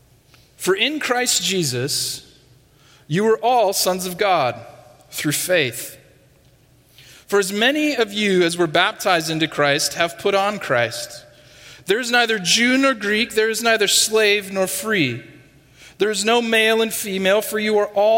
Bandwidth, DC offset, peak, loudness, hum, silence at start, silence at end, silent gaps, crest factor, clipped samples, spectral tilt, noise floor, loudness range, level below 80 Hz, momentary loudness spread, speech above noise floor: 16.5 kHz; under 0.1%; 0 dBFS; -18 LUFS; none; 0.6 s; 0 s; none; 20 dB; under 0.1%; -2.5 dB/octave; -53 dBFS; 5 LU; -60 dBFS; 9 LU; 35 dB